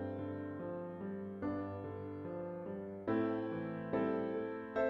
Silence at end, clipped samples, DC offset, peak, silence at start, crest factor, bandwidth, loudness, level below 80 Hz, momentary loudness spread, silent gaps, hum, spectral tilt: 0 s; under 0.1%; under 0.1%; -24 dBFS; 0 s; 16 dB; 5.8 kHz; -41 LUFS; -72 dBFS; 8 LU; none; none; -10 dB/octave